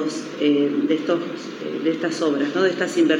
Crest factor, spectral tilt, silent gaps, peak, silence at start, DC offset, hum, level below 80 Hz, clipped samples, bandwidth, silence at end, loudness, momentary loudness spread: 16 dB; -5 dB/octave; none; -4 dBFS; 0 s; under 0.1%; none; -88 dBFS; under 0.1%; 10.5 kHz; 0 s; -22 LUFS; 8 LU